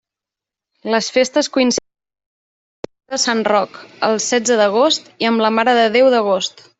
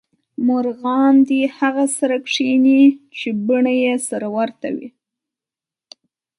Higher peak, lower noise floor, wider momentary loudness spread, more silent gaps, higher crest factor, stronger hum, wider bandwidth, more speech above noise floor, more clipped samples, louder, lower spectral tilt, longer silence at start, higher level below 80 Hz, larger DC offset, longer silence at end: about the same, -2 dBFS vs -4 dBFS; about the same, -86 dBFS vs -89 dBFS; about the same, 12 LU vs 12 LU; first, 2.26-2.83 s vs none; about the same, 14 dB vs 14 dB; neither; second, 8.4 kHz vs 11.5 kHz; about the same, 71 dB vs 73 dB; neither; about the same, -16 LUFS vs -17 LUFS; second, -2.5 dB/octave vs -4 dB/octave; first, 0.85 s vs 0.4 s; first, -62 dBFS vs -72 dBFS; neither; second, 0.3 s vs 1.5 s